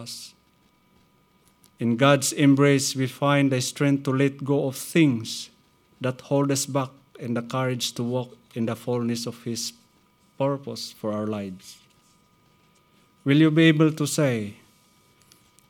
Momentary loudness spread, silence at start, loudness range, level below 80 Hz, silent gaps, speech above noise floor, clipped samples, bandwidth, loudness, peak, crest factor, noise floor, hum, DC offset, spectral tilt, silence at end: 15 LU; 0 s; 9 LU; -72 dBFS; none; 39 dB; under 0.1%; 18 kHz; -24 LUFS; -4 dBFS; 22 dB; -62 dBFS; none; under 0.1%; -5 dB/octave; 1.15 s